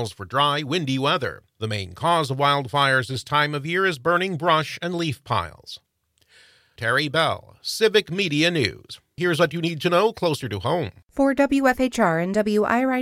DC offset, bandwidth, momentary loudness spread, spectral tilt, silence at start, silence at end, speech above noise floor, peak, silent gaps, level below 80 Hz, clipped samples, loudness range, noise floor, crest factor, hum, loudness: under 0.1%; 16 kHz; 9 LU; -5 dB/octave; 0 s; 0 s; 40 dB; -4 dBFS; none; -56 dBFS; under 0.1%; 3 LU; -62 dBFS; 18 dB; none; -22 LUFS